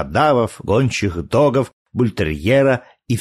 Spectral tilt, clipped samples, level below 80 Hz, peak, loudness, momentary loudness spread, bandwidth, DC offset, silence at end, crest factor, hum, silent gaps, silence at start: -6.5 dB/octave; under 0.1%; -40 dBFS; -4 dBFS; -18 LUFS; 7 LU; 13.5 kHz; under 0.1%; 0 s; 14 dB; none; 1.73-1.85 s; 0 s